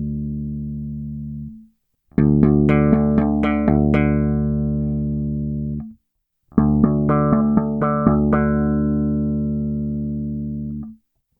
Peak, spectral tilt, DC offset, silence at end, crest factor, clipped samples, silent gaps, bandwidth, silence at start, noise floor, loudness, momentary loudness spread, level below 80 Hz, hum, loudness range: 0 dBFS; -11.5 dB/octave; under 0.1%; 0.45 s; 18 dB; under 0.1%; none; 3.5 kHz; 0 s; -72 dBFS; -19 LUFS; 14 LU; -32 dBFS; none; 3 LU